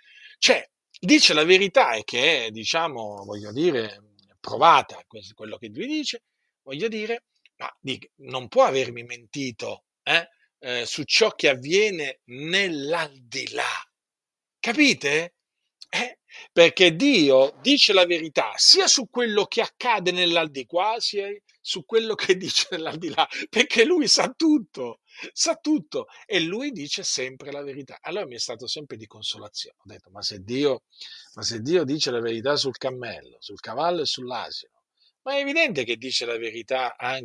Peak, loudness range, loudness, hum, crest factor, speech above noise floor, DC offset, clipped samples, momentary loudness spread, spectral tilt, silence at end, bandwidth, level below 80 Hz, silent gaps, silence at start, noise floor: 0 dBFS; 10 LU; -22 LUFS; none; 24 dB; over 67 dB; under 0.1%; under 0.1%; 19 LU; -2.5 dB/octave; 0 s; 12 kHz; -74 dBFS; none; 0.25 s; under -90 dBFS